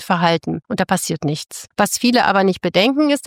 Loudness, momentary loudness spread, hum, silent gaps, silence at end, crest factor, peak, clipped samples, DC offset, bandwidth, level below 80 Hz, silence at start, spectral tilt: -17 LUFS; 9 LU; none; none; 0 s; 14 dB; -2 dBFS; under 0.1%; under 0.1%; 17 kHz; -56 dBFS; 0 s; -4.5 dB/octave